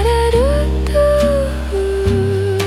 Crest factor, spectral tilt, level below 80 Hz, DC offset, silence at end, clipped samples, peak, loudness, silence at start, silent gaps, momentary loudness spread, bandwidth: 12 dB; -6.5 dB/octave; -20 dBFS; under 0.1%; 0 s; under 0.1%; -2 dBFS; -15 LUFS; 0 s; none; 5 LU; 14.5 kHz